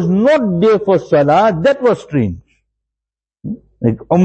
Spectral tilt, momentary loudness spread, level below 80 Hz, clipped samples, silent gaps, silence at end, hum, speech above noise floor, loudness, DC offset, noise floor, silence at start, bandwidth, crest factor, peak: -8 dB/octave; 17 LU; -46 dBFS; under 0.1%; none; 0 s; none; 74 dB; -13 LUFS; under 0.1%; -86 dBFS; 0 s; 8.4 kHz; 14 dB; 0 dBFS